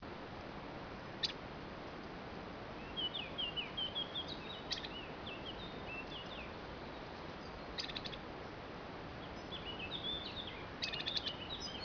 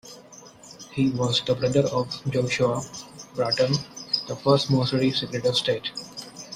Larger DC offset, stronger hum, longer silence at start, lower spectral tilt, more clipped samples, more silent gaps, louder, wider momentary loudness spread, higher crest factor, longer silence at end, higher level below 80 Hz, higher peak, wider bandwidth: neither; neither; about the same, 0 s vs 0.05 s; second, -1.5 dB/octave vs -5 dB/octave; neither; neither; second, -43 LUFS vs -24 LUFS; second, 9 LU vs 16 LU; about the same, 22 dB vs 18 dB; about the same, 0 s vs 0 s; about the same, -60 dBFS vs -58 dBFS; second, -24 dBFS vs -6 dBFS; second, 5.4 kHz vs 15 kHz